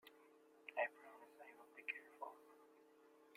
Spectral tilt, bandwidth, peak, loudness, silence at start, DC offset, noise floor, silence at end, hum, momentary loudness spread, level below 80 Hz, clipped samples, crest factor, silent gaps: -2.5 dB/octave; 15.5 kHz; -28 dBFS; -50 LUFS; 0.05 s; under 0.1%; -70 dBFS; 0 s; none; 24 LU; under -90 dBFS; under 0.1%; 26 dB; none